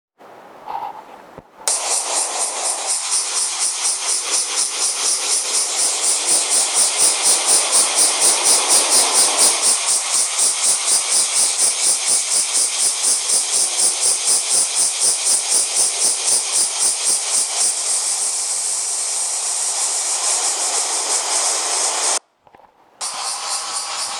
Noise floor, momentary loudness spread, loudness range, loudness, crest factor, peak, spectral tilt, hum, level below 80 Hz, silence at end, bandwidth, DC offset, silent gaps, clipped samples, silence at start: -50 dBFS; 7 LU; 6 LU; -15 LUFS; 18 dB; -2 dBFS; 3 dB/octave; none; -74 dBFS; 0 s; over 20 kHz; under 0.1%; none; under 0.1%; 0.2 s